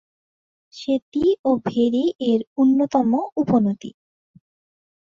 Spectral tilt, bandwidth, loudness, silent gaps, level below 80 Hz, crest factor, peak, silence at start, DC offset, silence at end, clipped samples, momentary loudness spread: -7.5 dB/octave; 7.4 kHz; -20 LUFS; 1.02-1.12 s, 1.39-1.44 s, 2.15-2.19 s, 2.47-2.56 s; -58 dBFS; 16 dB; -6 dBFS; 0.75 s; under 0.1%; 1.15 s; under 0.1%; 6 LU